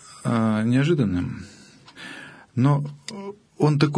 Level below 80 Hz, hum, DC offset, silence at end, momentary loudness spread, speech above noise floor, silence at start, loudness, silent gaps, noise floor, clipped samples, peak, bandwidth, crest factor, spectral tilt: -56 dBFS; none; under 0.1%; 0 s; 19 LU; 22 dB; 0.1 s; -23 LUFS; none; -44 dBFS; under 0.1%; -4 dBFS; 10.5 kHz; 18 dB; -7.5 dB/octave